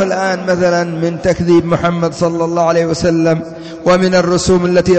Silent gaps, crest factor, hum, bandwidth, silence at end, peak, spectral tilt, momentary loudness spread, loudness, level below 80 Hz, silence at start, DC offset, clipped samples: none; 10 dB; none; 9 kHz; 0 s; -2 dBFS; -6 dB/octave; 5 LU; -13 LUFS; -38 dBFS; 0 s; under 0.1%; under 0.1%